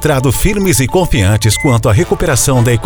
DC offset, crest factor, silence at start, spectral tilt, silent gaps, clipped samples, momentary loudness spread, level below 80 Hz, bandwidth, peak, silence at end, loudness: under 0.1%; 10 dB; 0 s; -5 dB/octave; none; under 0.1%; 2 LU; -22 dBFS; over 20 kHz; 0 dBFS; 0 s; -11 LUFS